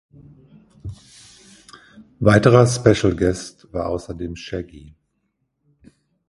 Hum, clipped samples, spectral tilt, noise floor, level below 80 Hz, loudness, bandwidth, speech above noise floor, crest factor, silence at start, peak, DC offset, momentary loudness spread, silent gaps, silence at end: none; under 0.1%; -6 dB/octave; -72 dBFS; -42 dBFS; -18 LUFS; 11.5 kHz; 54 dB; 22 dB; 0.85 s; 0 dBFS; under 0.1%; 24 LU; none; 1.5 s